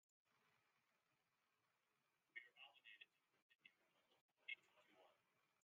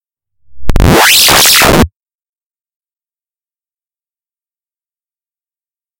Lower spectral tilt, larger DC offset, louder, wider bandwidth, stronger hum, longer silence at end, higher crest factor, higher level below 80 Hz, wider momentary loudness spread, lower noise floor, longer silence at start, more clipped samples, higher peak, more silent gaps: second, 2.5 dB/octave vs -2.5 dB/octave; neither; second, -61 LUFS vs -5 LUFS; second, 4.8 kHz vs over 20 kHz; neither; second, 0.2 s vs 4.1 s; first, 30 dB vs 12 dB; second, under -90 dBFS vs -20 dBFS; second, 10 LU vs 14 LU; about the same, -89 dBFS vs under -90 dBFS; second, 0.3 s vs 0.5 s; second, under 0.1% vs 0.6%; second, -40 dBFS vs 0 dBFS; first, 3.42-3.49 s, 3.55-3.59 s, 4.21-4.29 s vs none